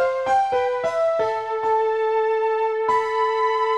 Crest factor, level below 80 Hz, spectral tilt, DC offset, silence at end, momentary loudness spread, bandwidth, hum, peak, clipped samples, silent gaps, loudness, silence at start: 12 dB; -62 dBFS; -3 dB/octave; 0.1%; 0 s; 2 LU; 9.4 kHz; none; -10 dBFS; under 0.1%; none; -21 LUFS; 0 s